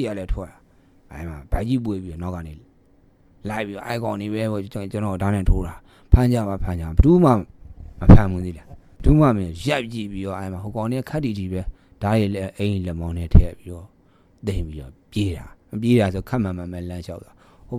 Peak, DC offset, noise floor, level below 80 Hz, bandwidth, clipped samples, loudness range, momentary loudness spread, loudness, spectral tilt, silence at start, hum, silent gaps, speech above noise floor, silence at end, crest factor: 0 dBFS; under 0.1%; -56 dBFS; -28 dBFS; 15 kHz; under 0.1%; 11 LU; 19 LU; -22 LUFS; -8 dB/octave; 0 s; none; none; 36 dB; 0 s; 20 dB